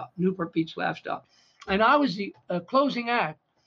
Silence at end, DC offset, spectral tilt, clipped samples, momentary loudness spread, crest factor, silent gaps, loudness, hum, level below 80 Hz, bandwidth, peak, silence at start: 0.35 s; under 0.1%; -7 dB/octave; under 0.1%; 13 LU; 18 dB; none; -26 LUFS; none; -60 dBFS; 7.2 kHz; -8 dBFS; 0 s